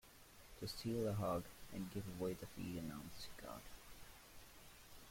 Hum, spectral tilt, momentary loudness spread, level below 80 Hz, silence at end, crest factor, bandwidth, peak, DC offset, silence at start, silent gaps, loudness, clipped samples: none; -5.5 dB/octave; 18 LU; -64 dBFS; 0 s; 18 dB; 16.5 kHz; -30 dBFS; under 0.1%; 0.05 s; none; -47 LUFS; under 0.1%